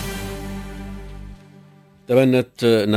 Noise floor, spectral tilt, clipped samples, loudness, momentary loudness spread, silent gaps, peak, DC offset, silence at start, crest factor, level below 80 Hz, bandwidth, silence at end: -49 dBFS; -6.5 dB/octave; under 0.1%; -20 LUFS; 22 LU; none; -2 dBFS; under 0.1%; 0 s; 18 dB; -40 dBFS; 16 kHz; 0 s